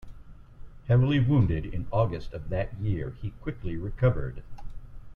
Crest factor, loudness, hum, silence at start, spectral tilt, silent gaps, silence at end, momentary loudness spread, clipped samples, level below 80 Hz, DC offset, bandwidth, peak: 18 dB; -28 LUFS; none; 0 s; -10 dB/octave; none; 0 s; 21 LU; under 0.1%; -40 dBFS; under 0.1%; 4.5 kHz; -10 dBFS